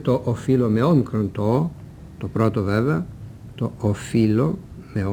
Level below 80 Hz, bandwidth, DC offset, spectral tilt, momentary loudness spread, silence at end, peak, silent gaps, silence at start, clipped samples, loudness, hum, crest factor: -46 dBFS; 13 kHz; under 0.1%; -8.5 dB/octave; 16 LU; 0 s; -6 dBFS; none; 0 s; under 0.1%; -22 LUFS; none; 16 dB